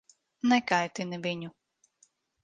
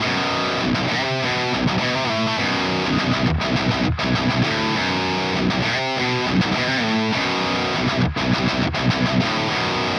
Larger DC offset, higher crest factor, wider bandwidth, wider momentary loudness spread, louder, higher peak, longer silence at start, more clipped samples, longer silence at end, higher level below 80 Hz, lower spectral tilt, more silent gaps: neither; first, 22 dB vs 14 dB; second, 9.2 kHz vs 10.5 kHz; first, 12 LU vs 1 LU; second, -29 LUFS vs -20 LUFS; second, -10 dBFS vs -6 dBFS; first, 0.45 s vs 0 s; neither; first, 0.95 s vs 0 s; second, -76 dBFS vs -40 dBFS; about the same, -4.5 dB/octave vs -5 dB/octave; neither